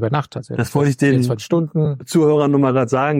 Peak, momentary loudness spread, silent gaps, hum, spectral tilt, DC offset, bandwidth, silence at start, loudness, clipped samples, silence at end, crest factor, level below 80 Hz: -4 dBFS; 7 LU; none; none; -7 dB/octave; under 0.1%; 16 kHz; 0 s; -17 LUFS; under 0.1%; 0 s; 12 dB; -54 dBFS